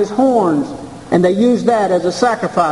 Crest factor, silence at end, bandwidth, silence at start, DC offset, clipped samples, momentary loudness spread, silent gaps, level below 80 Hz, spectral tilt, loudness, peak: 14 dB; 0 s; 11.5 kHz; 0 s; 0.3%; under 0.1%; 6 LU; none; -50 dBFS; -6 dB/octave; -14 LUFS; 0 dBFS